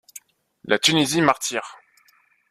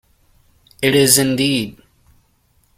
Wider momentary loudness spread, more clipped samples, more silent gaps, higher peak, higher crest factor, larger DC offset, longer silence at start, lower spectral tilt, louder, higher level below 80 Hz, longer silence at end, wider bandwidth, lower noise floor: first, 20 LU vs 10 LU; neither; neither; about the same, -2 dBFS vs 0 dBFS; about the same, 22 dB vs 20 dB; neither; second, 0.15 s vs 0.8 s; about the same, -3 dB/octave vs -3 dB/octave; second, -20 LUFS vs -14 LUFS; second, -64 dBFS vs -52 dBFS; second, 0.8 s vs 1.05 s; about the same, 15 kHz vs 16.5 kHz; about the same, -60 dBFS vs -59 dBFS